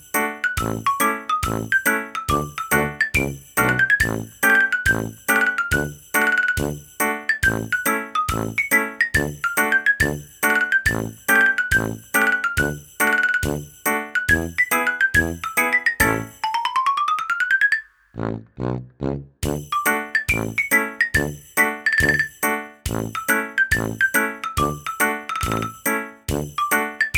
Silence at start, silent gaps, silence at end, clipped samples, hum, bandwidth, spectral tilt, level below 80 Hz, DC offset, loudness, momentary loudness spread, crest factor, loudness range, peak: 0.15 s; none; 0 s; under 0.1%; none; over 20 kHz; -3.5 dB/octave; -40 dBFS; under 0.1%; -20 LUFS; 8 LU; 18 dB; 3 LU; -2 dBFS